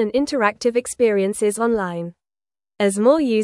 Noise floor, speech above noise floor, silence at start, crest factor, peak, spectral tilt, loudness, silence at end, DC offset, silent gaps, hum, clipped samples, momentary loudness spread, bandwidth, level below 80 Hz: under -90 dBFS; over 71 dB; 0 s; 18 dB; -2 dBFS; -5 dB/octave; -19 LUFS; 0 s; under 0.1%; none; none; under 0.1%; 8 LU; 12 kHz; -56 dBFS